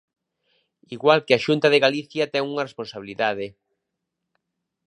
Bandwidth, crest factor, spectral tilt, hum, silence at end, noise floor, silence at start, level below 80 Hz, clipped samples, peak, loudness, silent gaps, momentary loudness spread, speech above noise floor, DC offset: 11 kHz; 22 dB; -5 dB/octave; none; 1.4 s; -81 dBFS; 0.9 s; -70 dBFS; under 0.1%; -2 dBFS; -21 LUFS; none; 16 LU; 59 dB; under 0.1%